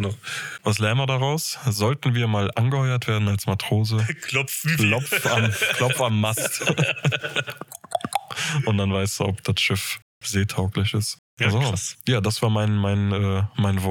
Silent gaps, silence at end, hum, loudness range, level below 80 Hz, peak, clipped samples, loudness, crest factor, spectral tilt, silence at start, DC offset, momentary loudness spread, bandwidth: 10.02-10.21 s, 11.19-11.37 s; 0 s; none; 3 LU; -60 dBFS; -6 dBFS; under 0.1%; -23 LUFS; 16 dB; -4.5 dB/octave; 0 s; under 0.1%; 6 LU; 19.5 kHz